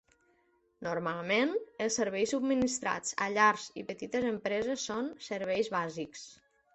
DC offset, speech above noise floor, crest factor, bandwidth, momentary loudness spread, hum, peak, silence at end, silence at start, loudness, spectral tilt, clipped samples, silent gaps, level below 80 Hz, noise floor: under 0.1%; 39 dB; 22 dB; 8.4 kHz; 14 LU; none; -10 dBFS; 0.4 s; 0.8 s; -32 LUFS; -3.5 dB/octave; under 0.1%; none; -68 dBFS; -71 dBFS